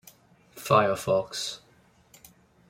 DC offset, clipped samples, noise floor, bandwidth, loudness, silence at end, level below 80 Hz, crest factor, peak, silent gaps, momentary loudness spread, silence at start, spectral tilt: under 0.1%; under 0.1%; -60 dBFS; 16 kHz; -26 LUFS; 1.1 s; -64 dBFS; 22 dB; -8 dBFS; none; 17 LU; 0.55 s; -4.5 dB/octave